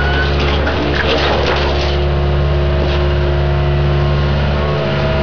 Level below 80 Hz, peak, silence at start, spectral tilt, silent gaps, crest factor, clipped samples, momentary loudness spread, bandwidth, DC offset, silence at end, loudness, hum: -18 dBFS; -6 dBFS; 0 s; -7 dB/octave; none; 8 dB; under 0.1%; 2 LU; 5.4 kHz; 4%; 0 s; -15 LUFS; none